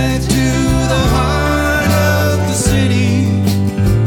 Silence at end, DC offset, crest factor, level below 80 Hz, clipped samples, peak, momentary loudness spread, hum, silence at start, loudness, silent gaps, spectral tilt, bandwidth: 0 s; under 0.1%; 12 dB; -22 dBFS; under 0.1%; 0 dBFS; 2 LU; none; 0 s; -13 LUFS; none; -5.5 dB/octave; 19 kHz